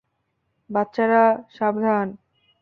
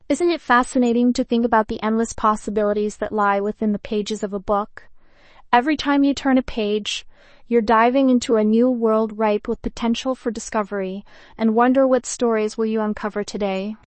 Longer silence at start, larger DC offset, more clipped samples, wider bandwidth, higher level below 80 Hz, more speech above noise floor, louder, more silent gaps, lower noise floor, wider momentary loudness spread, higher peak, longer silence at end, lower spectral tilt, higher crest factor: first, 0.7 s vs 0.1 s; neither; neither; second, 5.8 kHz vs 8.8 kHz; second, -70 dBFS vs -46 dBFS; first, 53 dB vs 28 dB; about the same, -21 LUFS vs -20 LUFS; neither; first, -73 dBFS vs -48 dBFS; about the same, 9 LU vs 9 LU; about the same, -4 dBFS vs -2 dBFS; first, 0.45 s vs 0.15 s; first, -8.5 dB/octave vs -5 dB/octave; about the same, 18 dB vs 18 dB